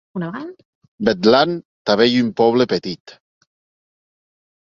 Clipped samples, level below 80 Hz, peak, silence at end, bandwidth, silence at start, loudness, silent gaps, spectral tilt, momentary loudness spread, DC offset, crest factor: under 0.1%; -58 dBFS; 0 dBFS; 1.55 s; 7.4 kHz; 0.15 s; -17 LUFS; 0.65-0.82 s, 0.88-0.98 s, 1.65-1.85 s, 3.00-3.05 s; -6 dB/octave; 17 LU; under 0.1%; 20 dB